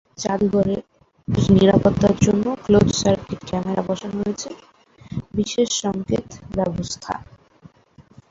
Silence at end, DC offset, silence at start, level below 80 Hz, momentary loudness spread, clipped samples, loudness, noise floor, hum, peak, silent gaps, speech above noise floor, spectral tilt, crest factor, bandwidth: 0.3 s; under 0.1%; 0.2 s; -42 dBFS; 14 LU; under 0.1%; -20 LUFS; -52 dBFS; none; 0 dBFS; none; 32 dB; -6 dB/octave; 20 dB; 7.8 kHz